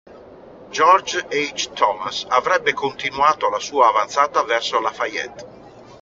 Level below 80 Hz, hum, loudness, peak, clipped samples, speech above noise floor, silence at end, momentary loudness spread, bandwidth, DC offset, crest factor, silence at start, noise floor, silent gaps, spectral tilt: -60 dBFS; none; -19 LUFS; -2 dBFS; under 0.1%; 23 dB; 0.05 s; 9 LU; 7.8 kHz; under 0.1%; 18 dB; 0.1 s; -42 dBFS; none; 0 dB/octave